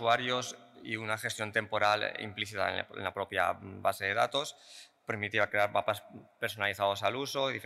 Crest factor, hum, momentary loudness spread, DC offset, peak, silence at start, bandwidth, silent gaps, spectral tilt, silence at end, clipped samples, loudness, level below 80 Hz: 20 dB; none; 10 LU; under 0.1%; -14 dBFS; 0 s; 16 kHz; none; -3.5 dB/octave; 0 s; under 0.1%; -32 LUFS; -78 dBFS